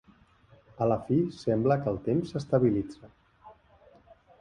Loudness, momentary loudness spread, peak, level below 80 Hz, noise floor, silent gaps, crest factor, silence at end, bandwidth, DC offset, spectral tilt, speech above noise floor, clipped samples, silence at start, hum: -28 LUFS; 5 LU; -10 dBFS; -58 dBFS; -60 dBFS; none; 18 dB; 0.9 s; 10.5 kHz; under 0.1%; -9 dB/octave; 33 dB; under 0.1%; 0.8 s; none